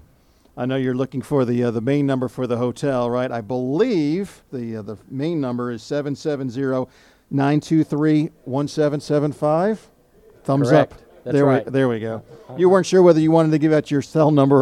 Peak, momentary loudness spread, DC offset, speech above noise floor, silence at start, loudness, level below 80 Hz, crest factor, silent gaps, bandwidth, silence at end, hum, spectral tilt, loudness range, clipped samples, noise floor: -2 dBFS; 13 LU; under 0.1%; 36 dB; 0.55 s; -20 LUFS; -58 dBFS; 18 dB; none; 12 kHz; 0 s; none; -7.5 dB/octave; 7 LU; under 0.1%; -55 dBFS